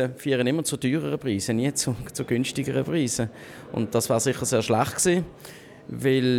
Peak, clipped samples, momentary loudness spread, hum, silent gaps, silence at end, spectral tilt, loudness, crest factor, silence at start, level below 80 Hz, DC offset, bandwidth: -8 dBFS; under 0.1%; 12 LU; none; none; 0 s; -4.5 dB/octave; -25 LUFS; 18 dB; 0 s; -56 dBFS; under 0.1%; 18.5 kHz